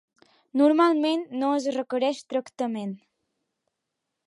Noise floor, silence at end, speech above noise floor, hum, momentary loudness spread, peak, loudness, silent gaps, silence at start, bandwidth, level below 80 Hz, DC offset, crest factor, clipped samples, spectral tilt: -83 dBFS; 1.3 s; 59 dB; none; 12 LU; -10 dBFS; -25 LUFS; none; 0.55 s; 11 kHz; -82 dBFS; under 0.1%; 16 dB; under 0.1%; -5 dB/octave